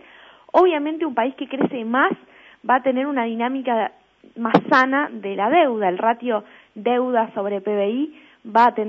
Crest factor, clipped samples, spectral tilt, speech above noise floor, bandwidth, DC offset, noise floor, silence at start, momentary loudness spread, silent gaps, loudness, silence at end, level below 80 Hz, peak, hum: 20 dB; under 0.1%; -7 dB/octave; 28 dB; 7.4 kHz; under 0.1%; -47 dBFS; 0.55 s; 9 LU; none; -20 LUFS; 0 s; -68 dBFS; 0 dBFS; none